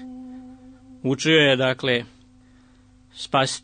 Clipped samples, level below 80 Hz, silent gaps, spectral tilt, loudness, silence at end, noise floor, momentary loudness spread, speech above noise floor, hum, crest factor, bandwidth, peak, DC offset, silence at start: under 0.1%; -60 dBFS; none; -4 dB/octave; -20 LUFS; 0.05 s; -53 dBFS; 24 LU; 33 dB; none; 20 dB; 9.6 kHz; -6 dBFS; under 0.1%; 0 s